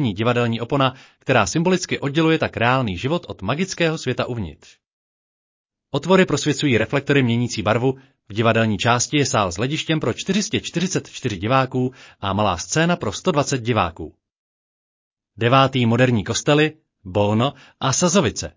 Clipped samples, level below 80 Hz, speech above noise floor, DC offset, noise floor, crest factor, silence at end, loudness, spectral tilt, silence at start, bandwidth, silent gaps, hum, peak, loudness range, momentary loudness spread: under 0.1%; -46 dBFS; over 70 dB; under 0.1%; under -90 dBFS; 18 dB; 0.05 s; -20 LUFS; -5 dB/octave; 0 s; 7.8 kHz; 4.86-5.65 s, 14.38-15.17 s; none; -4 dBFS; 4 LU; 9 LU